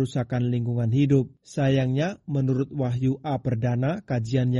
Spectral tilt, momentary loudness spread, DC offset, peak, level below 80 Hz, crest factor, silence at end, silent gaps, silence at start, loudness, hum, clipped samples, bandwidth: -8 dB/octave; 5 LU; under 0.1%; -10 dBFS; -54 dBFS; 14 dB; 0 s; none; 0 s; -25 LUFS; none; under 0.1%; 7.8 kHz